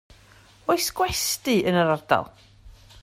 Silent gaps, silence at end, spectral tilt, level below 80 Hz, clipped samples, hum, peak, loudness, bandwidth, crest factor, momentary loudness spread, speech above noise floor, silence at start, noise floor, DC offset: none; 0.3 s; -3.5 dB/octave; -50 dBFS; under 0.1%; none; -4 dBFS; -23 LUFS; 16 kHz; 20 dB; 5 LU; 30 dB; 0.7 s; -53 dBFS; under 0.1%